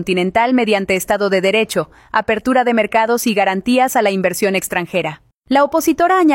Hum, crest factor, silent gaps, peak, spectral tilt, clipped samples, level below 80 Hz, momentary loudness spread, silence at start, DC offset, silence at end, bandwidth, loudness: none; 14 dB; 5.34-5.42 s; -2 dBFS; -4.5 dB/octave; under 0.1%; -50 dBFS; 6 LU; 0 s; under 0.1%; 0 s; 16.5 kHz; -15 LUFS